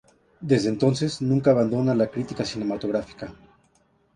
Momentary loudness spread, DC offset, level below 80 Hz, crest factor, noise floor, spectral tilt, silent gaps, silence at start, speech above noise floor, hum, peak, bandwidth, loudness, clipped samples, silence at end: 17 LU; under 0.1%; -56 dBFS; 18 dB; -64 dBFS; -7 dB/octave; none; 0.4 s; 41 dB; none; -6 dBFS; 11 kHz; -23 LUFS; under 0.1%; 0.8 s